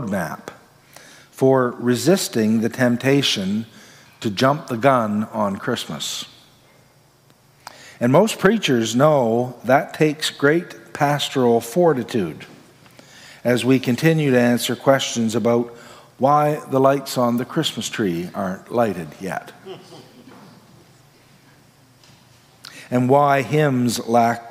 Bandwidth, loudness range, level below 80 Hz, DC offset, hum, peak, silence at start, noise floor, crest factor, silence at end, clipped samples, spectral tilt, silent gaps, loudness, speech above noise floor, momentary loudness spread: 16 kHz; 7 LU; -66 dBFS; under 0.1%; none; -2 dBFS; 0 s; -54 dBFS; 18 dB; 0 s; under 0.1%; -5 dB/octave; none; -19 LUFS; 35 dB; 13 LU